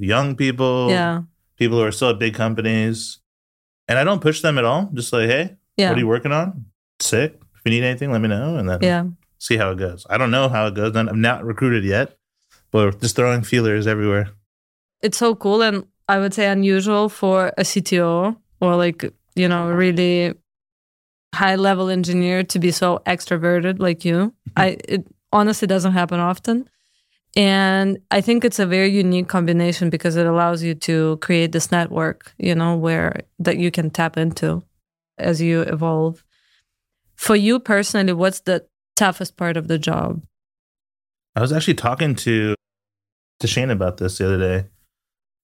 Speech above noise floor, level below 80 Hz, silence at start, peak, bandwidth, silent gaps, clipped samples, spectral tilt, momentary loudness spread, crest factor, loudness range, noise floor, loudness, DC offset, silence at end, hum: 52 dB; -54 dBFS; 0 s; -2 dBFS; 16.5 kHz; 3.26-3.87 s, 6.75-6.99 s, 14.46-14.89 s, 20.72-21.31 s, 40.59-40.75 s, 41.29-41.33 s, 43.12-43.40 s; under 0.1%; -5.5 dB/octave; 8 LU; 18 dB; 4 LU; -70 dBFS; -19 LUFS; under 0.1%; 0.75 s; none